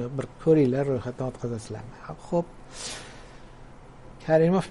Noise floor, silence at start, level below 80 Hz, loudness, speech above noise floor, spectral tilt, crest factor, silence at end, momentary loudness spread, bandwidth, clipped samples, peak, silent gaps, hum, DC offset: -46 dBFS; 0 s; -50 dBFS; -26 LUFS; 20 dB; -7 dB/octave; 18 dB; 0 s; 19 LU; 11.5 kHz; under 0.1%; -8 dBFS; none; none; under 0.1%